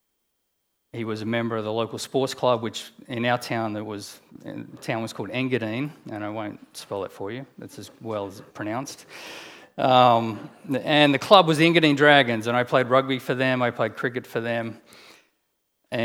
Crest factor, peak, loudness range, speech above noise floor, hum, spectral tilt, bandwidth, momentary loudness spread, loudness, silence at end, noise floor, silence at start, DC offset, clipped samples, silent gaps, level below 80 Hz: 24 dB; 0 dBFS; 13 LU; 49 dB; none; -5 dB/octave; 17 kHz; 22 LU; -23 LUFS; 0 s; -73 dBFS; 0.95 s; under 0.1%; under 0.1%; none; -74 dBFS